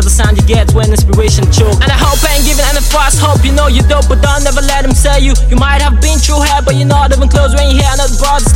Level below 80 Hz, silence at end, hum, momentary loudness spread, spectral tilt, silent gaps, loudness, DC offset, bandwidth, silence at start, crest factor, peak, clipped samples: -10 dBFS; 0 s; none; 2 LU; -4.5 dB/octave; none; -9 LUFS; under 0.1%; 17 kHz; 0 s; 8 dB; 0 dBFS; 0.2%